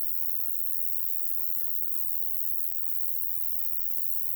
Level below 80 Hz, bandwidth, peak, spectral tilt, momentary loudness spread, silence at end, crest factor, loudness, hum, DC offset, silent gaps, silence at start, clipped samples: -58 dBFS; over 20 kHz; -14 dBFS; -1 dB/octave; 1 LU; 0 s; 14 dB; -25 LUFS; 50 Hz at -60 dBFS; under 0.1%; none; 0 s; under 0.1%